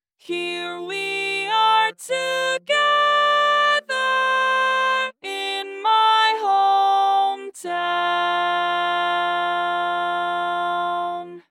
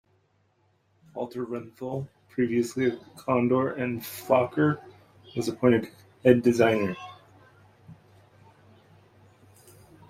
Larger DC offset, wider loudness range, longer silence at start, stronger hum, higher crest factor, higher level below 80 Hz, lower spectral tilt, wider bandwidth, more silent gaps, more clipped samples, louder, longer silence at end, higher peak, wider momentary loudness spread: neither; second, 3 LU vs 7 LU; second, 0.3 s vs 1.15 s; neither; second, 14 dB vs 24 dB; second, under -90 dBFS vs -64 dBFS; second, -1.5 dB/octave vs -6.5 dB/octave; about the same, 16 kHz vs 16 kHz; neither; neither; first, -20 LUFS vs -26 LUFS; second, 0.1 s vs 2.15 s; about the same, -6 dBFS vs -6 dBFS; second, 10 LU vs 15 LU